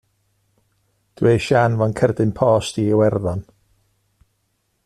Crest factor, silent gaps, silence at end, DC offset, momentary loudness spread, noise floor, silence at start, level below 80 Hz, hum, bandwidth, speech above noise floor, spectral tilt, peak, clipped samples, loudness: 16 dB; none; 1.45 s; under 0.1%; 6 LU; -69 dBFS; 1.2 s; -50 dBFS; none; 12.5 kHz; 52 dB; -7 dB/octave; -4 dBFS; under 0.1%; -18 LUFS